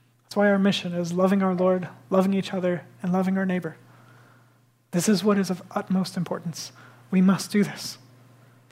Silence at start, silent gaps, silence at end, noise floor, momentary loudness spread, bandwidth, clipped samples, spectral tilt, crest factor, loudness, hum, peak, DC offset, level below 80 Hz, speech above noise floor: 0.3 s; none; 0.75 s; -60 dBFS; 11 LU; 15.5 kHz; under 0.1%; -6 dB/octave; 16 dB; -24 LUFS; none; -8 dBFS; under 0.1%; -74 dBFS; 37 dB